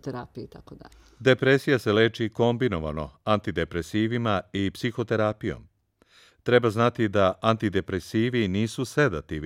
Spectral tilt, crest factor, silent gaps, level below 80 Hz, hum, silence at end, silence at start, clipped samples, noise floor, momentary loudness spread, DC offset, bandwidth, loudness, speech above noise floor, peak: -6.5 dB/octave; 20 dB; none; -50 dBFS; none; 0 s; 0.05 s; under 0.1%; -61 dBFS; 12 LU; under 0.1%; 15.5 kHz; -25 LUFS; 36 dB; -4 dBFS